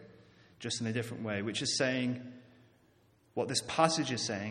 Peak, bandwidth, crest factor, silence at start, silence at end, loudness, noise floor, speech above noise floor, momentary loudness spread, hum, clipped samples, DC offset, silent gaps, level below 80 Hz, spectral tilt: -10 dBFS; 14.5 kHz; 26 dB; 0 s; 0 s; -33 LUFS; -67 dBFS; 34 dB; 13 LU; none; under 0.1%; under 0.1%; none; -72 dBFS; -3.5 dB/octave